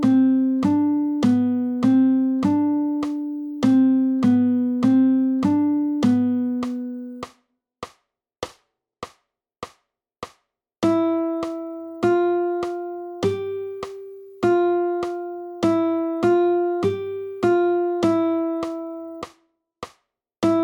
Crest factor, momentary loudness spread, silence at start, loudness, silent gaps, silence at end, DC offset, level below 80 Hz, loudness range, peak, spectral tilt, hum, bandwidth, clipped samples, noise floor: 14 dB; 22 LU; 0 s; -21 LUFS; none; 0 s; under 0.1%; -60 dBFS; 10 LU; -8 dBFS; -7.5 dB/octave; none; 9.6 kHz; under 0.1%; -68 dBFS